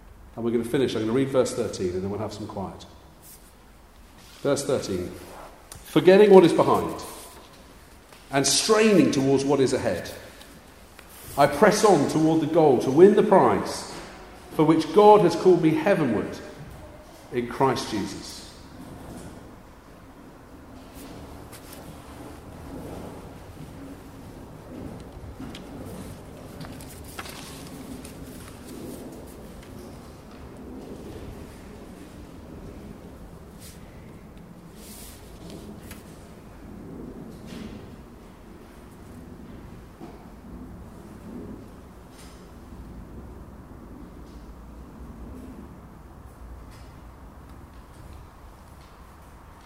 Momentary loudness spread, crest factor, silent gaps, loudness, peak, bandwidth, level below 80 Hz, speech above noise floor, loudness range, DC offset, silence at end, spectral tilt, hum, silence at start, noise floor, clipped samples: 27 LU; 26 dB; none; -21 LUFS; 0 dBFS; 16 kHz; -50 dBFS; 30 dB; 24 LU; under 0.1%; 1.2 s; -5 dB/octave; none; 0.35 s; -51 dBFS; under 0.1%